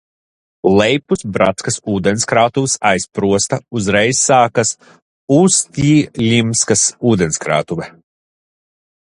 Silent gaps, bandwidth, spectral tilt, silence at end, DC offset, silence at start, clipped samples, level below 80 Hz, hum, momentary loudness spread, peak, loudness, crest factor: 5.02-5.28 s; 11.5 kHz; -4 dB/octave; 1.3 s; under 0.1%; 0.65 s; under 0.1%; -46 dBFS; none; 8 LU; 0 dBFS; -14 LUFS; 16 dB